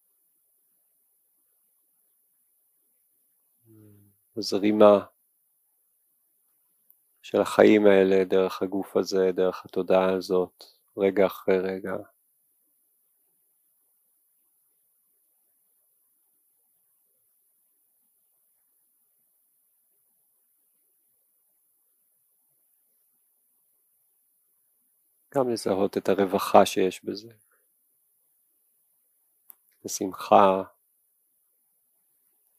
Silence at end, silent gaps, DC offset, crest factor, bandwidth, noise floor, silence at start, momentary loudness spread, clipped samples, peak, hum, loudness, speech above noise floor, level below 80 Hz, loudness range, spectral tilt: 1.95 s; none; under 0.1%; 26 dB; 15.5 kHz; -70 dBFS; 4.35 s; 17 LU; under 0.1%; -2 dBFS; none; -23 LUFS; 48 dB; -80 dBFS; 12 LU; -5.5 dB/octave